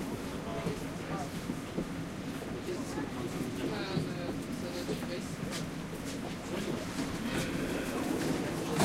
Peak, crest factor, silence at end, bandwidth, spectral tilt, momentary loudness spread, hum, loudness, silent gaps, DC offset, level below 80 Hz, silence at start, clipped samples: -16 dBFS; 20 dB; 0 s; 16 kHz; -5 dB/octave; 5 LU; none; -37 LUFS; none; under 0.1%; -54 dBFS; 0 s; under 0.1%